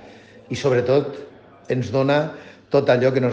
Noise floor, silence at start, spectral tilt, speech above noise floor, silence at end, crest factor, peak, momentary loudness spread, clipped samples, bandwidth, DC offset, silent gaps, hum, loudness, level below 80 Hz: -45 dBFS; 0.05 s; -7 dB/octave; 25 dB; 0 s; 18 dB; -4 dBFS; 14 LU; under 0.1%; 8.4 kHz; under 0.1%; none; none; -20 LUFS; -60 dBFS